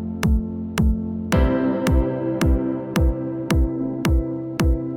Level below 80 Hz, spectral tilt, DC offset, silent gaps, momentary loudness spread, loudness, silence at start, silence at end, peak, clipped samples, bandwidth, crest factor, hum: -24 dBFS; -7 dB/octave; under 0.1%; none; 4 LU; -22 LUFS; 0 s; 0 s; -8 dBFS; under 0.1%; 16.5 kHz; 14 dB; none